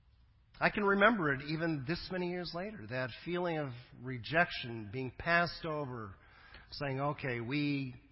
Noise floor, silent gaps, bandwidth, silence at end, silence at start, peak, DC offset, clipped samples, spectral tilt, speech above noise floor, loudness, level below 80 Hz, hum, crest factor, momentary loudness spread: -65 dBFS; none; 5.8 kHz; 0.1 s; 0.55 s; -14 dBFS; under 0.1%; under 0.1%; -9.5 dB/octave; 30 dB; -35 LUFS; -60 dBFS; none; 22 dB; 14 LU